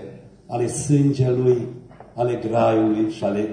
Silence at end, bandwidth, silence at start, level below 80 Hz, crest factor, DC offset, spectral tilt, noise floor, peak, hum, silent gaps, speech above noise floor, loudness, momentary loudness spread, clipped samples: 0 s; 10 kHz; 0 s; -54 dBFS; 14 dB; under 0.1%; -7 dB/octave; -40 dBFS; -6 dBFS; none; none; 20 dB; -21 LUFS; 16 LU; under 0.1%